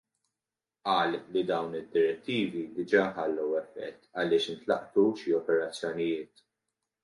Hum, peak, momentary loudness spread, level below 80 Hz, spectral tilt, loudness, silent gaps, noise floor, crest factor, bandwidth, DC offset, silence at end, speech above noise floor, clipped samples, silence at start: none; -10 dBFS; 9 LU; -74 dBFS; -5.5 dB/octave; -30 LUFS; none; under -90 dBFS; 20 dB; 11 kHz; under 0.1%; 0.8 s; over 61 dB; under 0.1%; 0.85 s